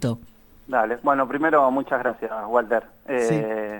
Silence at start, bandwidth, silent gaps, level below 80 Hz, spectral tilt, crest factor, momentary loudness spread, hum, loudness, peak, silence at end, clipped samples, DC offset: 0 s; 19 kHz; none; -56 dBFS; -6.5 dB/octave; 18 dB; 9 LU; none; -23 LUFS; -6 dBFS; 0 s; under 0.1%; under 0.1%